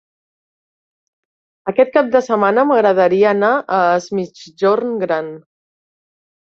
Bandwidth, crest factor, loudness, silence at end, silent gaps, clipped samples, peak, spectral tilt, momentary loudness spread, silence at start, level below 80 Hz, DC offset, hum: 7.4 kHz; 16 dB; -15 LUFS; 1.1 s; none; under 0.1%; -2 dBFS; -6 dB/octave; 11 LU; 1.65 s; -64 dBFS; under 0.1%; none